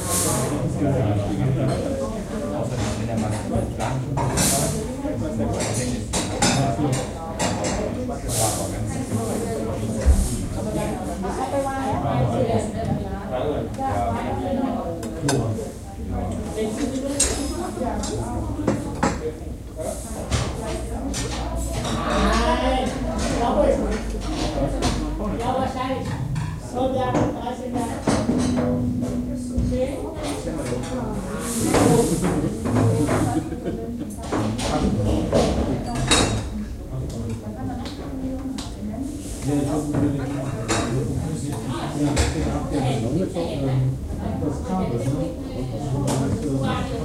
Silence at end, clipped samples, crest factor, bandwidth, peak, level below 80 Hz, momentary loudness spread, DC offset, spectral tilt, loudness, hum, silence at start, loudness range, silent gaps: 0 s; under 0.1%; 22 dB; 16 kHz; -2 dBFS; -32 dBFS; 9 LU; under 0.1%; -5 dB/octave; -24 LUFS; none; 0 s; 3 LU; none